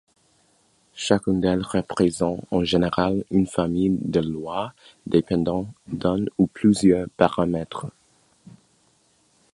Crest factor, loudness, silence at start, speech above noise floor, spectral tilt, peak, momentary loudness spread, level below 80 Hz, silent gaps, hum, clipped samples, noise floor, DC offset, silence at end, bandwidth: 22 dB; -23 LUFS; 0.95 s; 41 dB; -6.5 dB/octave; 0 dBFS; 11 LU; -48 dBFS; none; none; under 0.1%; -62 dBFS; under 0.1%; 1.65 s; 11.5 kHz